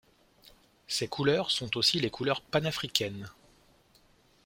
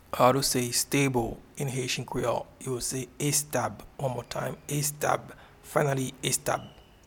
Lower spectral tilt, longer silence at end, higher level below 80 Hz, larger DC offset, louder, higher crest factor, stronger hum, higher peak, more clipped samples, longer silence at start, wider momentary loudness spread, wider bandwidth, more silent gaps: about the same, -3.5 dB/octave vs -4 dB/octave; first, 1.15 s vs 0.25 s; second, -64 dBFS vs -54 dBFS; neither; about the same, -29 LUFS vs -29 LUFS; first, 28 dB vs 22 dB; neither; about the same, -6 dBFS vs -8 dBFS; neither; first, 0.45 s vs 0.1 s; about the same, 10 LU vs 10 LU; second, 16.5 kHz vs 19 kHz; neither